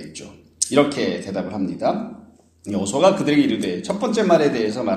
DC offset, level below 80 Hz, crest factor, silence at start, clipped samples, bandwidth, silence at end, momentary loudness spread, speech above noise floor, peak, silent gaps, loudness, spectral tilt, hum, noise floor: under 0.1%; -58 dBFS; 20 dB; 0 s; under 0.1%; 13 kHz; 0 s; 12 LU; 20 dB; 0 dBFS; none; -20 LUFS; -4.5 dB/octave; none; -40 dBFS